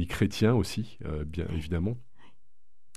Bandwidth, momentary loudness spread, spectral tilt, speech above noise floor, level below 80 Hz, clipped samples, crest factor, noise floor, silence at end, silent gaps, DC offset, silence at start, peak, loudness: 14 kHz; 11 LU; -6.5 dB/octave; 44 dB; -44 dBFS; under 0.1%; 18 dB; -73 dBFS; 0.95 s; none; 0.9%; 0 s; -12 dBFS; -30 LUFS